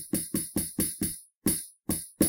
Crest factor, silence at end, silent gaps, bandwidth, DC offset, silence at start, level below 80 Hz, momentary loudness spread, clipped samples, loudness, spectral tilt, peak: 22 dB; 0 s; 1.36-1.41 s; 17 kHz; under 0.1%; 0 s; -52 dBFS; 4 LU; under 0.1%; -30 LUFS; -4 dB/octave; -10 dBFS